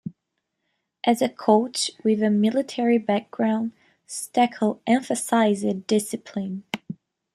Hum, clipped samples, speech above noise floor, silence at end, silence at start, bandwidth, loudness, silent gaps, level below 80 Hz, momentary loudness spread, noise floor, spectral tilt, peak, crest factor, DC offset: none; under 0.1%; 57 dB; 0.4 s; 0.05 s; 13.5 kHz; -23 LUFS; none; -70 dBFS; 13 LU; -79 dBFS; -4.5 dB/octave; -4 dBFS; 20 dB; under 0.1%